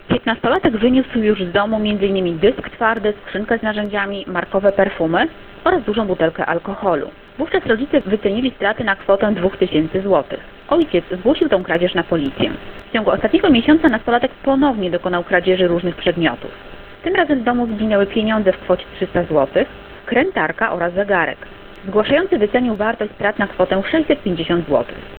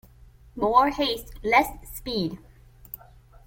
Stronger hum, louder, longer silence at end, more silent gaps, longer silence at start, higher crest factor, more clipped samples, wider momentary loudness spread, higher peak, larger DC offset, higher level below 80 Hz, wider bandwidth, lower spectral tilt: neither; first, -17 LUFS vs -24 LUFS; second, 0 s vs 0.5 s; neither; second, 0.1 s vs 0.55 s; second, 16 dB vs 22 dB; neither; second, 6 LU vs 21 LU; first, 0 dBFS vs -6 dBFS; neither; first, -42 dBFS vs -48 dBFS; second, 4.5 kHz vs 17 kHz; first, -9 dB/octave vs -4.5 dB/octave